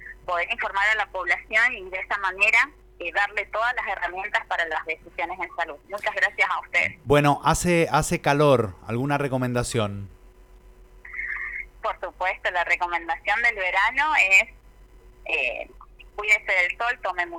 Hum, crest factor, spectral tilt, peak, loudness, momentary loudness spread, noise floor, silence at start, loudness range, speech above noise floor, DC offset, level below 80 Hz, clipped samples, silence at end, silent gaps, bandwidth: none; 20 dB; -4.5 dB/octave; -4 dBFS; -23 LUFS; 12 LU; -50 dBFS; 0 s; 7 LU; 26 dB; under 0.1%; -48 dBFS; under 0.1%; 0 s; none; 19.5 kHz